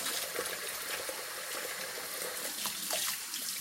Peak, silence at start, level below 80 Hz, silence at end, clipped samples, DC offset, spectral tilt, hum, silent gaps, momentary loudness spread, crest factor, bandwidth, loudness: -20 dBFS; 0 s; -76 dBFS; 0 s; under 0.1%; under 0.1%; 0.5 dB/octave; none; none; 5 LU; 18 dB; 17 kHz; -35 LUFS